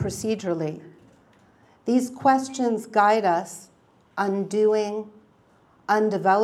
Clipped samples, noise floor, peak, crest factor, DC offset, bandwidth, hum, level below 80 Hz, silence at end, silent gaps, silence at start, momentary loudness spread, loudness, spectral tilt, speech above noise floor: under 0.1%; -58 dBFS; -6 dBFS; 18 dB; under 0.1%; 14.5 kHz; none; -64 dBFS; 0 s; none; 0 s; 17 LU; -23 LUFS; -5.5 dB/octave; 36 dB